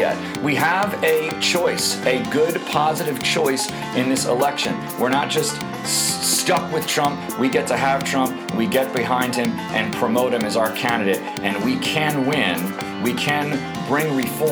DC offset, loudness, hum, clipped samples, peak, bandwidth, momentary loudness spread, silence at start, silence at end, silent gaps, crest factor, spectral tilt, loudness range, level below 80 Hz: under 0.1%; -20 LUFS; none; under 0.1%; -4 dBFS; over 20 kHz; 5 LU; 0 s; 0 s; none; 16 dB; -3.5 dB/octave; 1 LU; -56 dBFS